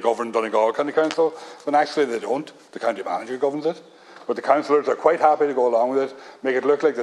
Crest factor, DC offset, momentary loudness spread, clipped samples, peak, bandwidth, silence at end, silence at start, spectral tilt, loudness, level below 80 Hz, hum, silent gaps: 18 dB; under 0.1%; 10 LU; under 0.1%; -2 dBFS; 11 kHz; 0 s; 0 s; -4.5 dB/octave; -22 LUFS; -78 dBFS; none; none